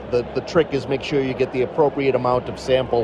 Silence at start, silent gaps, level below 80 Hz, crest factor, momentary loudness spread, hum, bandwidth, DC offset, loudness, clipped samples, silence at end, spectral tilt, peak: 0 s; none; -44 dBFS; 16 dB; 4 LU; none; 11 kHz; under 0.1%; -21 LUFS; under 0.1%; 0 s; -6.5 dB/octave; -6 dBFS